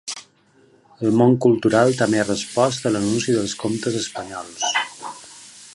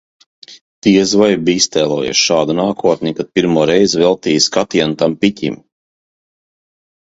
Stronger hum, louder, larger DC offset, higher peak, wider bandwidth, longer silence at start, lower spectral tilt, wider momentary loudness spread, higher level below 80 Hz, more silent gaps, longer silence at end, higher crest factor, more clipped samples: neither; second, -20 LUFS vs -13 LUFS; neither; about the same, -2 dBFS vs 0 dBFS; first, 11.5 kHz vs 8 kHz; second, 0.05 s vs 0.5 s; about the same, -4.5 dB/octave vs -4 dB/octave; first, 18 LU vs 6 LU; second, -58 dBFS vs -50 dBFS; second, none vs 0.61-0.82 s; second, 0.05 s vs 1.45 s; about the same, 18 dB vs 14 dB; neither